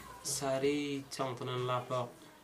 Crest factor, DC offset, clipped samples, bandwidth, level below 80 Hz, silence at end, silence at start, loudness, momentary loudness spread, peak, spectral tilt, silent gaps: 16 dB; under 0.1%; under 0.1%; 15.5 kHz; -68 dBFS; 0 s; 0 s; -36 LUFS; 6 LU; -22 dBFS; -4 dB/octave; none